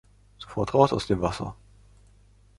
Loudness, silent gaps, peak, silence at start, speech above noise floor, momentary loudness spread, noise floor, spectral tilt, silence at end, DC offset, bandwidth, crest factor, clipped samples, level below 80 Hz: -25 LUFS; none; -4 dBFS; 0.4 s; 32 dB; 16 LU; -57 dBFS; -6.5 dB/octave; 1.05 s; under 0.1%; 11.5 kHz; 24 dB; under 0.1%; -48 dBFS